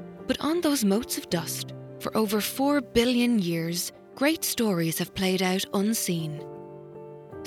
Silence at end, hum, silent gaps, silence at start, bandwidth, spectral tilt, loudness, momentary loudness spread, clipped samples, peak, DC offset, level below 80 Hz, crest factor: 0 s; none; none; 0 s; 18.5 kHz; -4.5 dB/octave; -26 LUFS; 15 LU; under 0.1%; -8 dBFS; under 0.1%; -56 dBFS; 18 dB